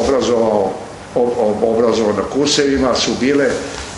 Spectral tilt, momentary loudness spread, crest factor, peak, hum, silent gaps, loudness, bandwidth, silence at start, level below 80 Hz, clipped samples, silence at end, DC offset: -4 dB/octave; 6 LU; 16 dB; 0 dBFS; none; none; -15 LUFS; 11.5 kHz; 0 s; -40 dBFS; under 0.1%; 0 s; under 0.1%